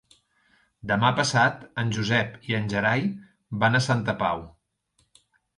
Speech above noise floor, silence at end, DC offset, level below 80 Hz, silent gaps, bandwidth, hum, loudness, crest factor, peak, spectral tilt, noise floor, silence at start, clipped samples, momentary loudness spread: 46 dB; 1.1 s; under 0.1%; -56 dBFS; none; 11.5 kHz; none; -24 LUFS; 20 dB; -6 dBFS; -5 dB/octave; -70 dBFS; 0.85 s; under 0.1%; 11 LU